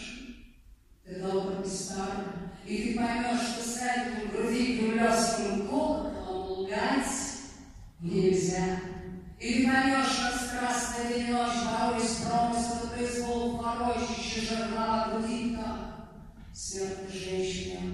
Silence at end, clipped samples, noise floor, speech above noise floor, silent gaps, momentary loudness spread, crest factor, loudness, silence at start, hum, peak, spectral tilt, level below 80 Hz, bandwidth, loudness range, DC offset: 0 s; under 0.1%; -56 dBFS; 26 dB; none; 14 LU; 18 dB; -30 LUFS; 0 s; none; -14 dBFS; -4 dB/octave; -50 dBFS; 13.5 kHz; 5 LU; under 0.1%